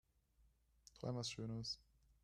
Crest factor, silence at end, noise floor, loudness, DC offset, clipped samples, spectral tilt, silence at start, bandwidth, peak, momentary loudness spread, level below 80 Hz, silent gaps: 18 dB; 0.4 s; -76 dBFS; -47 LUFS; under 0.1%; under 0.1%; -4.5 dB/octave; 0.95 s; 13 kHz; -32 dBFS; 6 LU; -72 dBFS; none